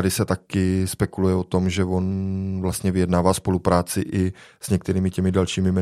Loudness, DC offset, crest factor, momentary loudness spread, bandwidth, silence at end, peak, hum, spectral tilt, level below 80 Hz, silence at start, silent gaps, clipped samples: -22 LUFS; under 0.1%; 20 dB; 5 LU; 14.5 kHz; 0 s; -2 dBFS; none; -6 dB/octave; -48 dBFS; 0 s; none; under 0.1%